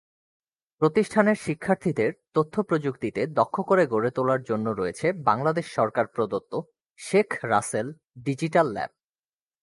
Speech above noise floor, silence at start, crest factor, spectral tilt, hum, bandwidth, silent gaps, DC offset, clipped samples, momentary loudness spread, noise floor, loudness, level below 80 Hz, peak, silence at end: over 65 dB; 0.8 s; 20 dB; -6.5 dB/octave; none; 11.5 kHz; 6.86-6.94 s; under 0.1%; under 0.1%; 9 LU; under -90 dBFS; -25 LUFS; -64 dBFS; -6 dBFS; 0.75 s